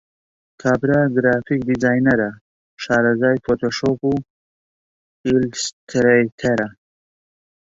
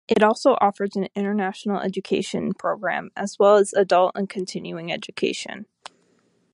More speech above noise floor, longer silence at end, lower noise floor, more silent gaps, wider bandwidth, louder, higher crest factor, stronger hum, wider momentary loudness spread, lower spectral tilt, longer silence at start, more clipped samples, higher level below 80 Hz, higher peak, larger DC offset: first, over 72 dB vs 42 dB; first, 1.05 s vs 0.9 s; first, under -90 dBFS vs -64 dBFS; first, 2.41-2.77 s, 4.30-5.24 s, 5.73-5.87 s, 6.32-6.38 s vs none; second, 8 kHz vs 11.5 kHz; first, -19 LUFS vs -22 LUFS; about the same, 18 dB vs 18 dB; neither; second, 9 LU vs 13 LU; about the same, -5.5 dB/octave vs -5 dB/octave; first, 0.65 s vs 0.1 s; neither; first, -50 dBFS vs -66 dBFS; about the same, -2 dBFS vs -4 dBFS; neither